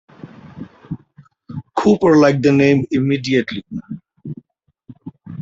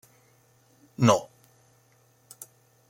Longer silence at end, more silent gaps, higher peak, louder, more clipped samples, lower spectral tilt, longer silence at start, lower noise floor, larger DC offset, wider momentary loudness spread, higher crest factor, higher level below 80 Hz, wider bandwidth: second, 0 s vs 1.65 s; neither; about the same, -2 dBFS vs -4 dBFS; first, -15 LUFS vs -24 LUFS; neither; first, -7 dB/octave vs -5.5 dB/octave; second, 0.25 s vs 1 s; about the same, -60 dBFS vs -63 dBFS; neither; about the same, 25 LU vs 26 LU; second, 18 dB vs 28 dB; first, -54 dBFS vs -74 dBFS; second, 7.8 kHz vs 16.5 kHz